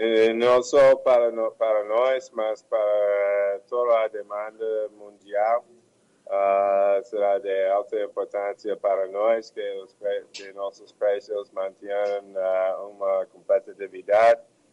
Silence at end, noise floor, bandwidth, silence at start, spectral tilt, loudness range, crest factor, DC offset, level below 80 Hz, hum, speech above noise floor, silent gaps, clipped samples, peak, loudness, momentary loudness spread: 0.3 s; -61 dBFS; 9.6 kHz; 0 s; -4 dB/octave; 7 LU; 14 dB; under 0.1%; -68 dBFS; none; 38 dB; none; under 0.1%; -10 dBFS; -24 LUFS; 14 LU